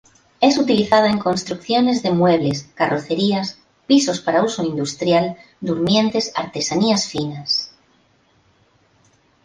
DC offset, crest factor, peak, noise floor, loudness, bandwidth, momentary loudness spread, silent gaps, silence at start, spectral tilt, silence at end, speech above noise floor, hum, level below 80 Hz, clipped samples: under 0.1%; 18 dB; -2 dBFS; -58 dBFS; -18 LUFS; 10 kHz; 8 LU; none; 0.4 s; -4.5 dB/octave; 1.8 s; 40 dB; none; -56 dBFS; under 0.1%